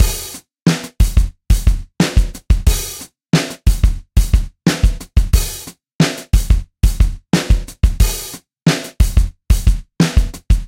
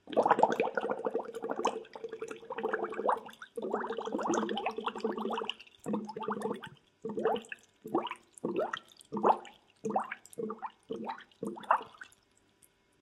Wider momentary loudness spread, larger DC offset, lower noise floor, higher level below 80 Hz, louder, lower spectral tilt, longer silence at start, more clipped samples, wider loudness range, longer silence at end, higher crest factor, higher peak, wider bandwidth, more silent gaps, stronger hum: second, 4 LU vs 14 LU; neither; second, -33 dBFS vs -69 dBFS; first, -16 dBFS vs -78 dBFS; first, -17 LUFS vs -35 LUFS; about the same, -5 dB/octave vs -4.5 dB/octave; about the same, 0 s vs 0.05 s; neither; about the same, 1 LU vs 3 LU; second, 0 s vs 1 s; second, 14 dB vs 26 dB; first, 0 dBFS vs -10 dBFS; first, 16.5 kHz vs 14 kHz; first, 0.62-0.66 s, 5.95-5.99 s vs none; neither